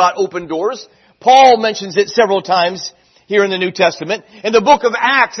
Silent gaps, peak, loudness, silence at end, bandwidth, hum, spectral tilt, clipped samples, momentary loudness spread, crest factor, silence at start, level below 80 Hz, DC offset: none; 0 dBFS; -13 LUFS; 0 s; 6.4 kHz; none; -3.5 dB/octave; under 0.1%; 13 LU; 14 dB; 0 s; -58 dBFS; under 0.1%